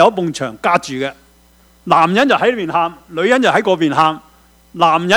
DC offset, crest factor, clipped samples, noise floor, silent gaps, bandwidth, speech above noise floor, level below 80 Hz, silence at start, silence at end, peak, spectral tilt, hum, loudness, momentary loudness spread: under 0.1%; 14 dB; under 0.1%; -49 dBFS; none; over 20 kHz; 35 dB; -54 dBFS; 0 s; 0 s; 0 dBFS; -5 dB/octave; none; -15 LUFS; 11 LU